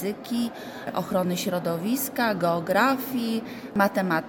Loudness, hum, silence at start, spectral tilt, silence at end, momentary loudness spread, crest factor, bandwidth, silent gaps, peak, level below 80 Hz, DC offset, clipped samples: -26 LUFS; none; 0 s; -5 dB/octave; 0 s; 9 LU; 18 dB; 19 kHz; none; -8 dBFS; -62 dBFS; under 0.1%; under 0.1%